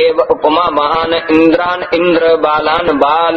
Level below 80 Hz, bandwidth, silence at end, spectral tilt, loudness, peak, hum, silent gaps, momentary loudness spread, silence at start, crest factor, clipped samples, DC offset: -42 dBFS; 6 kHz; 0 s; -6.5 dB/octave; -11 LUFS; 0 dBFS; none; none; 3 LU; 0 s; 10 dB; 0.1%; under 0.1%